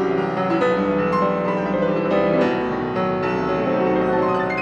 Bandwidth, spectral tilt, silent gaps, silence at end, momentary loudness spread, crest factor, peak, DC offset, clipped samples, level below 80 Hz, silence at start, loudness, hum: 8.2 kHz; -8 dB/octave; none; 0 s; 3 LU; 14 dB; -6 dBFS; under 0.1%; under 0.1%; -48 dBFS; 0 s; -20 LUFS; none